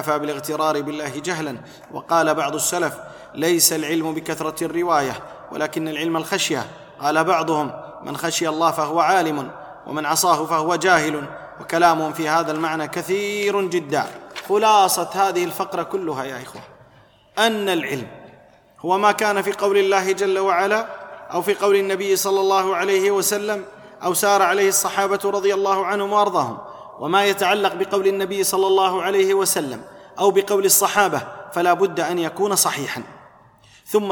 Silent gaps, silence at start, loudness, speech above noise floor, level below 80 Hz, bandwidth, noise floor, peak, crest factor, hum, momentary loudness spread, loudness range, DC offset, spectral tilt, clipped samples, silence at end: none; 0 s; -20 LUFS; 32 dB; -64 dBFS; 19 kHz; -52 dBFS; -2 dBFS; 18 dB; none; 13 LU; 4 LU; under 0.1%; -3 dB/octave; under 0.1%; 0 s